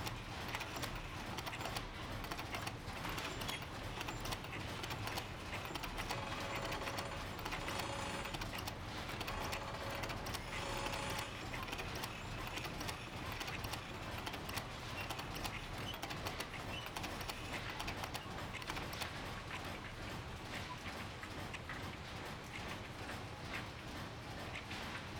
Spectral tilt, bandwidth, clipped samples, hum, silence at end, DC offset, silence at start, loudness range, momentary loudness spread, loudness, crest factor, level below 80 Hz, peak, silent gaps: -3.5 dB/octave; over 20 kHz; under 0.1%; none; 0 s; under 0.1%; 0 s; 4 LU; 5 LU; -44 LUFS; 20 dB; -56 dBFS; -26 dBFS; none